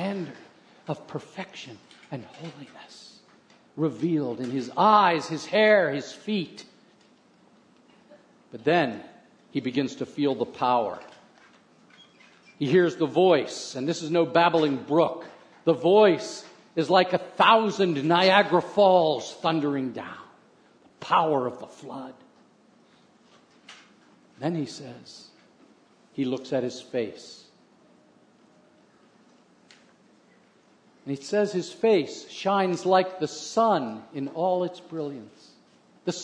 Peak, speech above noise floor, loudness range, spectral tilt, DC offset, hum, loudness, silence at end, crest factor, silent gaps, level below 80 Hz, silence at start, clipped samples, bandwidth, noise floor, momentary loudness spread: -4 dBFS; 35 dB; 16 LU; -5.5 dB/octave; under 0.1%; none; -24 LUFS; 0 s; 24 dB; none; -78 dBFS; 0 s; under 0.1%; 10 kHz; -60 dBFS; 22 LU